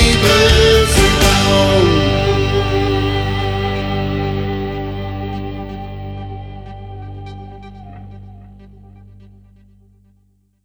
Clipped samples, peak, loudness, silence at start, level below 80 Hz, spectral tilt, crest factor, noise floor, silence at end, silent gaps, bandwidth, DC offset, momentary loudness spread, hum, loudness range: under 0.1%; 0 dBFS; -14 LUFS; 0 s; -24 dBFS; -4.5 dB/octave; 16 dB; -57 dBFS; 1.95 s; none; over 20 kHz; under 0.1%; 22 LU; none; 23 LU